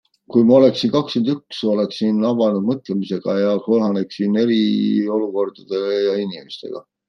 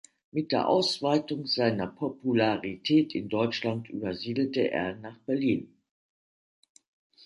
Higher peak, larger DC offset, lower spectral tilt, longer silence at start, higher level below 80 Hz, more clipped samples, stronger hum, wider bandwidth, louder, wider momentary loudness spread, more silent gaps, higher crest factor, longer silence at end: first, -2 dBFS vs -10 dBFS; neither; first, -7.5 dB/octave vs -6 dB/octave; about the same, 0.3 s vs 0.35 s; about the same, -64 dBFS vs -66 dBFS; neither; neither; second, 6.8 kHz vs 11.5 kHz; first, -18 LUFS vs -28 LUFS; about the same, 10 LU vs 9 LU; neither; about the same, 16 dB vs 18 dB; second, 0.3 s vs 1.6 s